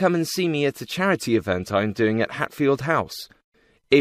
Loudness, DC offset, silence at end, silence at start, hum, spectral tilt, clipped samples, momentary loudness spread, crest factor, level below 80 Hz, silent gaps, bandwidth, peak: -23 LUFS; under 0.1%; 0 s; 0 s; none; -5.5 dB/octave; under 0.1%; 5 LU; 18 dB; -58 dBFS; 3.44-3.52 s; 15.5 kHz; -4 dBFS